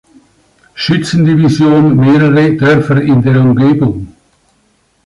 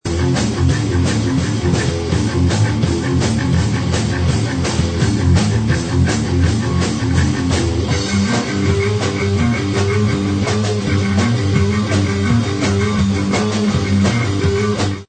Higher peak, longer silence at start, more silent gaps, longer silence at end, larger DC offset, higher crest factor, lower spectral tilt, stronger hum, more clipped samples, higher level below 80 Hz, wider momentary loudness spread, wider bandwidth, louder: about the same, 0 dBFS vs -2 dBFS; first, 0.75 s vs 0.05 s; neither; first, 1 s vs 0.05 s; neither; second, 8 dB vs 14 dB; first, -7.5 dB/octave vs -6 dB/octave; neither; neither; second, -42 dBFS vs -30 dBFS; first, 7 LU vs 2 LU; first, 11.5 kHz vs 9 kHz; first, -9 LUFS vs -16 LUFS